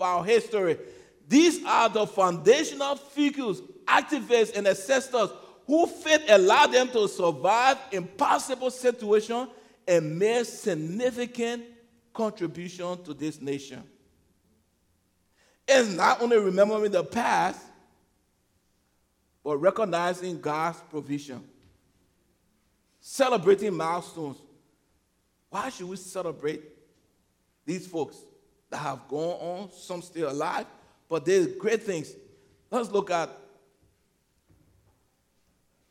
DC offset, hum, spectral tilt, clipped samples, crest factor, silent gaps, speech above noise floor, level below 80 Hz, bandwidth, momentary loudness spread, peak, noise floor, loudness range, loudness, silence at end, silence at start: under 0.1%; none; -4 dB/octave; under 0.1%; 22 dB; none; 46 dB; -72 dBFS; 16 kHz; 16 LU; -4 dBFS; -71 dBFS; 13 LU; -26 LUFS; 2.55 s; 0 s